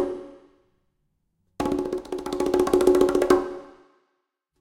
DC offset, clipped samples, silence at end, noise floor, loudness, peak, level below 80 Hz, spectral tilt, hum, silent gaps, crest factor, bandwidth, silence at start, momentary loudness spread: under 0.1%; under 0.1%; 0.9 s; -76 dBFS; -23 LUFS; -4 dBFS; -50 dBFS; -5.5 dB/octave; none; none; 22 dB; 16.5 kHz; 0 s; 15 LU